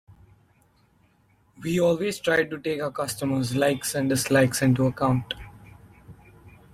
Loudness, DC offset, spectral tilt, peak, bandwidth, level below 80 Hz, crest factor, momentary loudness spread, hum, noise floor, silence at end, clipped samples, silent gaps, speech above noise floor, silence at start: -24 LUFS; under 0.1%; -5 dB/octave; -8 dBFS; 16 kHz; -54 dBFS; 18 dB; 8 LU; none; -62 dBFS; 0.25 s; under 0.1%; none; 39 dB; 1.6 s